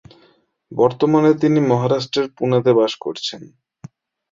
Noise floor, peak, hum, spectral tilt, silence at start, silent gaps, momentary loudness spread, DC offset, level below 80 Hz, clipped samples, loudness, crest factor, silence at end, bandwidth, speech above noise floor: -57 dBFS; -2 dBFS; none; -7 dB/octave; 0.7 s; none; 12 LU; under 0.1%; -60 dBFS; under 0.1%; -17 LUFS; 16 dB; 0.85 s; 7.6 kHz; 40 dB